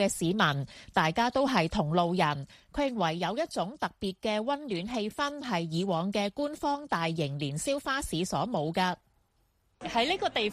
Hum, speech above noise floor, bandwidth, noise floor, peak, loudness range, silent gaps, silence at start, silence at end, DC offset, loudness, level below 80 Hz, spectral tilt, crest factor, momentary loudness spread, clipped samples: none; 41 dB; 15 kHz; -71 dBFS; -10 dBFS; 3 LU; none; 0 s; 0 s; under 0.1%; -30 LUFS; -56 dBFS; -5 dB/octave; 20 dB; 7 LU; under 0.1%